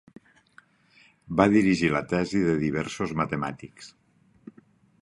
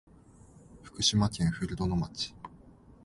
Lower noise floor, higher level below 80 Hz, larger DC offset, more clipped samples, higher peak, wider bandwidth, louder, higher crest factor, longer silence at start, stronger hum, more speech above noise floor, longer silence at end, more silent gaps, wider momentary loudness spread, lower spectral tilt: first, -60 dBFS vs -56 dBFS; second, -54 dBFS vs -48 dBFS; neither; neither; first, -4 dBFS vs -12 dBFS; about the same, 11.5 kHz vs 11.5 kHz; first, -25 LUFS vs -30 LUFS; about the same, 24 dB vs 22 dB; first, 1.3 s vs 0.7 s; neither; first, 35 dB vs 26 dB; first, 1.15 s vs 0.15 s; neither; second, 16 LU vs 23 LU; first, -6.5 dB/octave vs -4.5 dB/octave